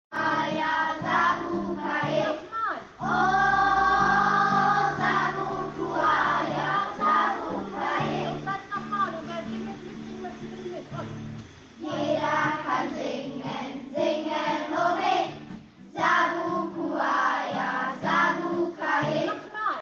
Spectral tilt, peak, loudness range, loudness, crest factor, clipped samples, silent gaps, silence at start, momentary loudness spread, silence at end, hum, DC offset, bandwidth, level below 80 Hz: -5 dB/octave; -10 dBFS; 8 LU; -26 LUFS; 16 dB; under 0.1%; none; 0.1 s; 15 LU; 0 s; none; under 0.1%; 7.6 kHz; -56 dBFS